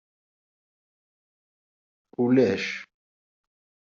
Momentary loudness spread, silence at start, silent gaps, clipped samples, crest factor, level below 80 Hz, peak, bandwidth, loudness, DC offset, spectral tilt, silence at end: 16 LU; 2.2 s; none; under 0.1%; 22 dB; -72 dBFS; -8 dBFS; 7.2 kHz; -24 LUFS; under 0.1%; -5.5 dB/octave; 1.15 s